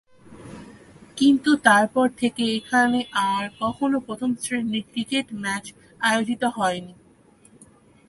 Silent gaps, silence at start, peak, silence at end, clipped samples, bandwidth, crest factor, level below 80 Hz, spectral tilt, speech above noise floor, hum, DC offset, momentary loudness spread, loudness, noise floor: none; 0.3 s; -2 dBFS; 1.15 s; under 0.1%; 11.5 kHz; 22 dB; -60 dBFS; -3.5 dB/octave; 32 dB; none; under 0.1%; 15 LU; -22 LUFS; -54 dBFS